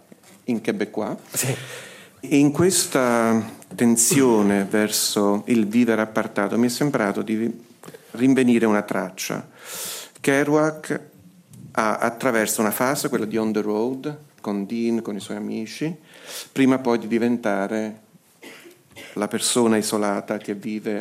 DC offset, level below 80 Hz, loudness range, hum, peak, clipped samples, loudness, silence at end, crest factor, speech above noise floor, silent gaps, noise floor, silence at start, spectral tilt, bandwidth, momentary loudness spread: under 0.1%; -70 dBFS; 6 LU; none; -4 dBFS; under 0.1%; -22 LUFS; 0 s; 18 dB; 26 dB; none; -47 dBFS; 0.5 s; -4 dB/octave; 16 kHz; 14 LU